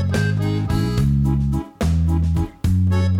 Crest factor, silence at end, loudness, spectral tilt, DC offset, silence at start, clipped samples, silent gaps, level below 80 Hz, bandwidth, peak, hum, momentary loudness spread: 10 dB; 0 s; -20 LUFS; -7.5 dB/octave; under 0.1%; 0 s; under 0.1%; none; -26 dBFS; 14 kHz; -8 dBFS; none; 4 LU